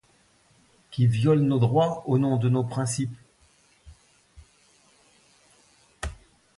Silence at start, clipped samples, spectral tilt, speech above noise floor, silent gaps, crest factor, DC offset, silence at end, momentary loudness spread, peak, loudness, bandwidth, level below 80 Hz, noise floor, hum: 0.9 s; under 0.1%; -7 dB/octave; 40 dB; none; 18 dB; under 0.1%; 0.45 s; 17 LU; -8 dBFS; -24 LUFS; 11.5 kHz; -50 dBFS; -62 dBFS; none